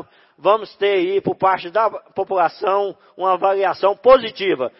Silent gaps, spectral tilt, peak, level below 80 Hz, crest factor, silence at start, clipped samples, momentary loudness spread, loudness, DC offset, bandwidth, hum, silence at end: none; -9 dB/octave; -2 dBFS; -54 dBFS; 18 dB; 0.45 s; under 0.1%; 8 LU; -18 LUFS; under 0.1%; 5.8 kHz; none; 0.1 s